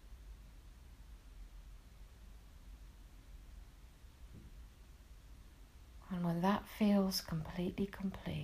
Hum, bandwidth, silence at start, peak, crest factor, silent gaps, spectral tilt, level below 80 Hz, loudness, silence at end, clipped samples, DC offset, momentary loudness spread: none; 15.5 kHz; 0.05 s; -20 dBFS; 22 dB; none; -6 dB/octave; -56 dBFS; -37 LUFS; 0 s; under 0.1%; under 0.1%; 26 LU